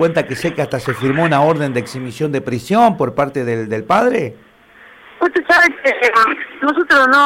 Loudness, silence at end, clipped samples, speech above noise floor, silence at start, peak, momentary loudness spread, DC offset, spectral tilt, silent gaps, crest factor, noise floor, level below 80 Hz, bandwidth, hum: -15 LUFS; 0 s; under 0.1%; 29 dB; 0 s; 0 dBFS; 10 LU; under 0.1%; -5.5 dB/octave; none; 14 dB; -44 dBFS; -52 dBFS; 16.5 kHz; none